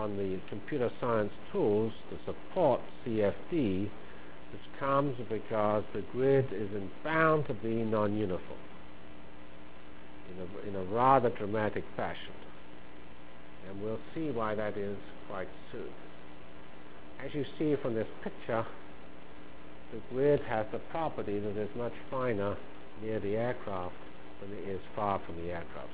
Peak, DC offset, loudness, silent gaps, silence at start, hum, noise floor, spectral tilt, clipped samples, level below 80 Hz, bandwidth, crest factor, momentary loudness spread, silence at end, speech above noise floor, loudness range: -10 dBFS; 1%; -34 LUFS; none; 0 s; none; -52 dBFS; -6 dB/octave; under 0.1%; -58 dBFS; 4 kHz; 24 dB; 23 LU; 0 s; 19 dB; 8 LU